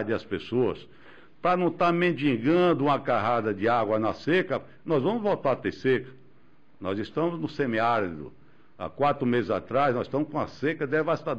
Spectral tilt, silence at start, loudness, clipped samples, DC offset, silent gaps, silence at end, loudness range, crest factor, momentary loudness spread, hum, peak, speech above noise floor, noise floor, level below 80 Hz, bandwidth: -8 dB/octave; 0 s; -26 LUFS; under 0.1%; 0.4%; none; 0 s; 5 LU; 12 dB; 9 LU; none; -14 dBFS; 35 dB; -61 dBFS; -60 dBFS; 7.8 kHz